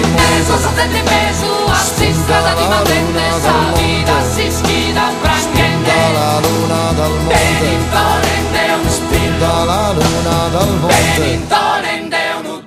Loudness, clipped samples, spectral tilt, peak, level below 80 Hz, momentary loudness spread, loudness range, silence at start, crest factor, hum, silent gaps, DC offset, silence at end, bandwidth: -13 LUFS; under 0.1%; -4 dB/octave; 0 dBFS; -28 dBFS; 3 LU; 1 LU; 0 s; 12 dB; none; none; under 0.1%; 0 s; 15.5 kHz